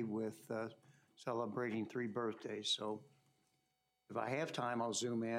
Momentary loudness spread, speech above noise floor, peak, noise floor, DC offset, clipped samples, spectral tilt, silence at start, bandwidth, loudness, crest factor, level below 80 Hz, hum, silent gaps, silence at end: 7 LU; 43 dB; -26 dBFS; -84 dBFS; under 0.1%; under 0.1%; -4 dB/octave; 0 s; 15.5 kHz; -42 LUFS; 18 dB; under -90 dBFS; none; none; 0 s